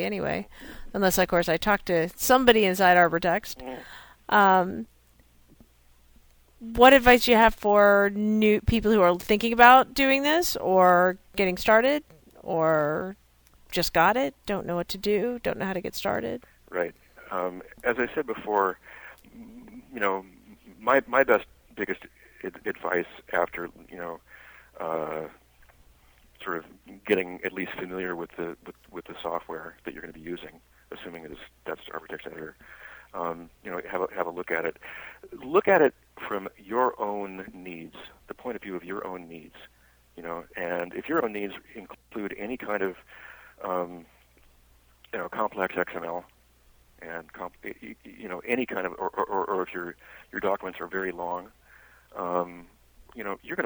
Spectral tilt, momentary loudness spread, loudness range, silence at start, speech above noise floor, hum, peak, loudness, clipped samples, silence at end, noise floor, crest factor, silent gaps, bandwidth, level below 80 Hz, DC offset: -4.5 dB/octave; 22 LU; 16 LU; 0 s; 34 dB; none; -2 dBFS; -25 LUFS; under 0.1%; 0 s; -60 dBFS; 24 dB; none; over 20 kHz; -50 dBFS; under 0.1%